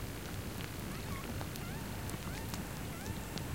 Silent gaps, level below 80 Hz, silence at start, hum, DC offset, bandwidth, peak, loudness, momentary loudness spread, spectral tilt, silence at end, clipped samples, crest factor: none; -50 dBFS; 0 s; none; 0.1%; 17 kHz; -20 dBFS; -42 LUFS; 1 LU; -4.5 dB/octave; 0 s; under 0.1%; 22 dB